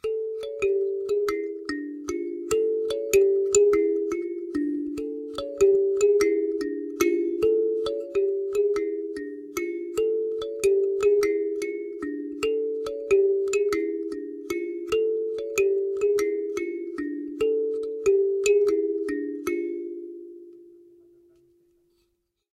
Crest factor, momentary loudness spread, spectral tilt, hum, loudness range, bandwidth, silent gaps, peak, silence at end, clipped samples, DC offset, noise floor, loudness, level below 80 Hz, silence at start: 20 dB; 12 LU; -3.5 dB/octave; none; 3 LU; 14 kHz; none; -6 dBFS; 1.85 s; under 0.1%; under 0.1%; -74 dBFS; -25 LUFS; -58 dBFS; 0.05 s